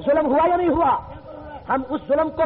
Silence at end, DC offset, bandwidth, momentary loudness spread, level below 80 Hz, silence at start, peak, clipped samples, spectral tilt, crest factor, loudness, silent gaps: 0 s; under 0.1%; 4.5 kHz; 19 LU; -46 dBFS; 0 s; -10 dBFS; under 0.1%; -5 dB/octave; 12 dB; -20 LUFS; none